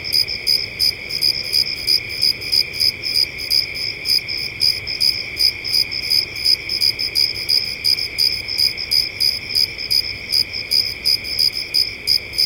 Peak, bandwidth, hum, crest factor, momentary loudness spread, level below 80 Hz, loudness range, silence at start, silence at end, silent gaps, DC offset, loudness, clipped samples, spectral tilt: -2 dBFS; 17 kHz; none; 16 dB; 3 LU; -46 dBFS; 1 LU; 0 s; 0 s; none; under 0.1%; -16 LUFS; under 0.1%; 0 dB/octave